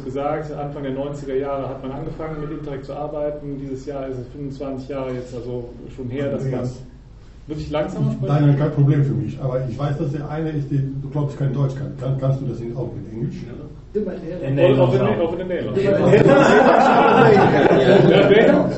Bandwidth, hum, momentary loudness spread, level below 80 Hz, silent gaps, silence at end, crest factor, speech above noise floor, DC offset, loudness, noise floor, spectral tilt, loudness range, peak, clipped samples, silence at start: 8.2 kHz; none; 17 LU; -42 dBFS; none; 0 s; 18 dB; 23 dB; under 0.1%; -18 LUFS; -41 dBFS; -8 dB/octave; 14 LU; 0 dBFS; under 0.1%; 0 s